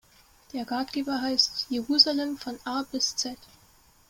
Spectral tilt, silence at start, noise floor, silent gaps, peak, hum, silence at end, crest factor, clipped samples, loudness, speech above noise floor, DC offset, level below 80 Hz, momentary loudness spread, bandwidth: -1.5 dB/octave; 0.55 s; -59 dBFS; none; -4 dBFS; none; 0.75 s; 24 dB; under 0.1%; -26 LUFS; 31 dB; under 0.1%; -64 dBFS; 15 LU; 17 kHz